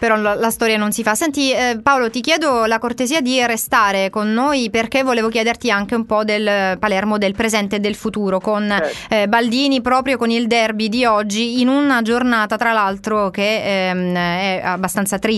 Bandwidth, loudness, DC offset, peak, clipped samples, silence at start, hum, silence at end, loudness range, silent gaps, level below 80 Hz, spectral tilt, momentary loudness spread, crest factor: 12.5 kHz; -17 LUFS; under 0.1%; -2 dBFS; under 0.1%; 0 s; none; 0 s; 2 LU; none; -48 dBFS; -4 dB/octave; 4 LU; 16 dB